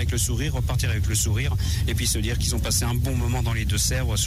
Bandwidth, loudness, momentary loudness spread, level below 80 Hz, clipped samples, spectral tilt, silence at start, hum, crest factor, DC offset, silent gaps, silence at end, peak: 16 kHz; -24 LUFS; 2 LU; -28 dBFS; under 0.1%; -4 dB/octave; 0 s; none; 12 dB; under 0.1%; none; 0 s; -10 dBFS